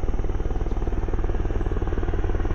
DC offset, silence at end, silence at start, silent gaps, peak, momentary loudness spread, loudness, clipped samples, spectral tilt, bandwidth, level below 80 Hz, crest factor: under 0.1%; 0 s; 0 s; none; -12 dBFS; 2 LU; -28 LUFS; under 0.1%; -8.5 dB/octave; 6.6 kHz; -24 dBFS; 12 dB